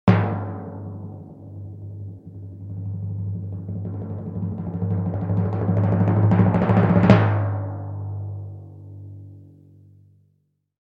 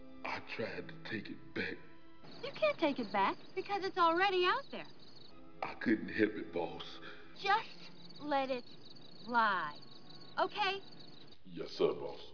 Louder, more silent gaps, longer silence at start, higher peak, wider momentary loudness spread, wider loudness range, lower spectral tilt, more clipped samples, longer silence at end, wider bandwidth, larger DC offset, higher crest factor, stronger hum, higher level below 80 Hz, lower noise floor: first, -22 LUFS vs -36 LUFS; neither; about the same, 0.05 s vs 0 s; first, 0 dBFS vs -18 dBFS; about the same, 22 LU vs 22 LU; first, 14 LU vs 4 LU; first, -10 dB/octave vs -2 dB/octave; neither; first, 1.35 s vs 0 s; about the same, 5.2 kHz vs 5.4 kHz; second, under 0.1% vs 0.3%; about the same, 22 dB vs 20 dB; neither; first, -50 dBFS vs -74 dBFS; first, -68 dBFS vs -58 dBFS